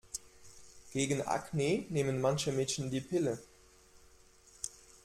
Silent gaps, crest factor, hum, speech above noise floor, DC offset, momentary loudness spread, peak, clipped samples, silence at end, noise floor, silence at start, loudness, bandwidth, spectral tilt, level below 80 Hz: none; 20 dB; none; 28 dB; under 0.1%; 13 LU; -16 dBFS; under 0.1%; 0.35 s; -61 dBFS; 0.15 s; -35 LUFS; 15.5 kHz; -5 dB/octave; -64 dBFS